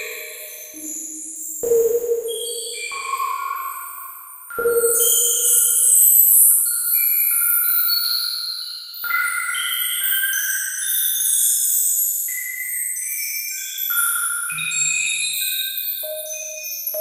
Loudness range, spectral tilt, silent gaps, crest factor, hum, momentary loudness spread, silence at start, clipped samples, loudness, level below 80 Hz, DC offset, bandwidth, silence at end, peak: 11 LU; 2.5 dB/octave; none; 20 dB; none; 16 LU; 0 s; under 0.1%; -17 LUFS; -66 dBFS; under 0.1%; 16 kHz; 0 s; 0 dBFS